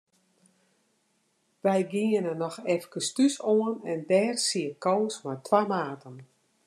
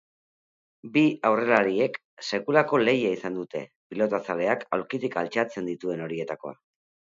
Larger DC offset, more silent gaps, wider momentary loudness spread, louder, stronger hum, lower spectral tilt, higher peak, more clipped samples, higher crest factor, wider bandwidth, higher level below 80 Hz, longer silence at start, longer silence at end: neither; second, none vs 2.05-2.17 s, 3.76-3.90 s; second, 8 LU vs 13 LU; about the same, -27 LUFS vs -26 LUFS; neither; second, -4.5 dB/octave vs -6 dB/octave; second, -8 dBFS vs -4 dBFS; neither; about the same, 20 dB vs 24 dB; first, 13 kHz vs 7.8 kHz; second, -86 dBFS vs -72 dBFS; first, 1.65 s vs 0.85 s; second, 0.45 s vs 0.65 s